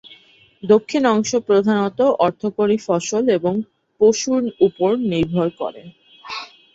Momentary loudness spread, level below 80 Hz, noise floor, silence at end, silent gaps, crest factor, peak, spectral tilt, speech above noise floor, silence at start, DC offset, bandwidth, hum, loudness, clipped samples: 13 LU; -56 dBFS; -51 dBFS; 0.3 s; none; 16 dB; -2 dBFS; -5.5 dB/octave; 33 dB; 0.65 s; under 0.1%; 8 kHz; none; -18 LUFS; under 0.1%